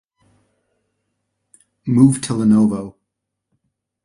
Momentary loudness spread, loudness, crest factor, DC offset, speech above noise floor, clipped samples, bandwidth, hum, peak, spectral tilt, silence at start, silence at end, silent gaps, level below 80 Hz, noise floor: 17 LU; -16 LUFS; 20 dB; under 0.1%; 64 dB; under 0.1%; 11.5 kHz; none; 0 dBFS; -7 dB/octave; 1.85 s; 1.15 s; none; -54 dBFS; -78 dBFS